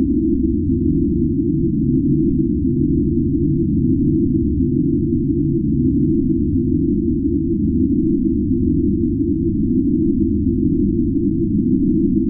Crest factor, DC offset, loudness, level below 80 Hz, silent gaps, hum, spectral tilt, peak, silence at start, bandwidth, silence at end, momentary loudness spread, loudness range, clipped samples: 12 dB; under 0.1%; -17 LUFS; -28 dBFS; none; none; -18.5 dB/octave; -4 dBFS; 0 s; 0.4 kHz; 0 s; 2 LU; 0 LU; under 0.1%